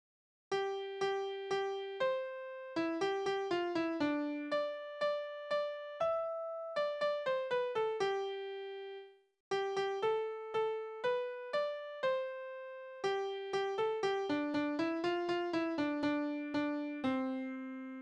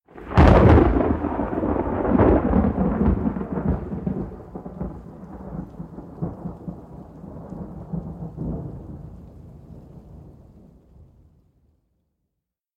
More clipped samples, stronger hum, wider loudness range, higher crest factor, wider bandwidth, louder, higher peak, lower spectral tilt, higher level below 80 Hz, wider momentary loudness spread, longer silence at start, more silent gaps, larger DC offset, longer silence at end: neither; neither; second, 2 LU vs 19 LU; second, 14 dB vs 22 dB; first, 9.8 kHz vs 6.6 kHz; second, -37 LUFS vs -21 LUFS; second, -22 dBFS vs 0 dBFS; second, -4.5 dB/octave vs -9.5 dB/octave; second, -78 dBFS vs -30 dBFS; second, 7 LU vs 24 LU; first, 0.5 s vs 0.15 s; first, 9.40-9.51 s vs none; neither; second, 0 s vs 2.45 s